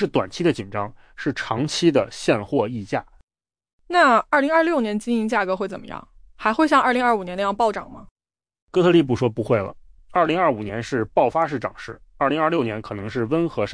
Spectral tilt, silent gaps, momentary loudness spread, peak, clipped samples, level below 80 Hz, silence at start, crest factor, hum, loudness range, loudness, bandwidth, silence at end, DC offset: -6 dB/octave; 3.23-3.27 s, 3.73-3.79 s, 8.11-8.16 s, 8.62-8.67 s; 13 LU; -6 dBFS; under 0.1%; -52 dBFS; 0 s; 16 dB; none; 3 LU; -21 LUFS; 10.5 kHz; 0 s; under 0.1%